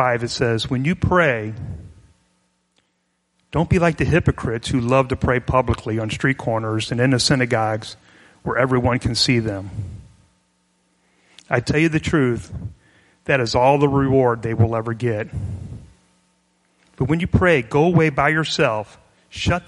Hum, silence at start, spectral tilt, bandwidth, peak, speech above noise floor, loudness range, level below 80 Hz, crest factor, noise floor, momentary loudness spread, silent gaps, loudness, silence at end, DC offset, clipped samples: none; 0 s; -6 dB/octave; 11.5 kHz; 0 dBFS; 50 dB; 4 LU; -38 dBFS; 20 dB; -69 dBFS; 16 LU; none; -19 LUFS; 0.05 s; under 0.1%; under 0.1%